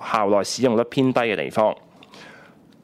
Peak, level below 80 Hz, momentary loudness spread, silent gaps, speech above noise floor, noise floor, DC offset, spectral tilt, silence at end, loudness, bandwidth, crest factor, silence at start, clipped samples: -6 dBFS; -64 dBFS; 3 LU; none; 29 dB; -49 dBFS; under 0.1%; -5 dB/octave; 0.5 s; -21 LUFS; 15 kHz; 16 dB; 0 s; under 0.1%